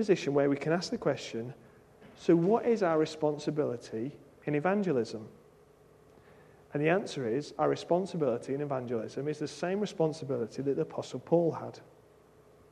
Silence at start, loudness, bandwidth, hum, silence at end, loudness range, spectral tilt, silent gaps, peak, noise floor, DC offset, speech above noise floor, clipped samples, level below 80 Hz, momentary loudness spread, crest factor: 0 s; -31 LUFS; 11 kHz; none; 0.9 s; 4 LU; -6.5 dB/octave; none; -12 dBFS; -60 dBFS; under 0.1%; 29 dB; under 0.1%; -72 dBFS; 12 LU; 20 dB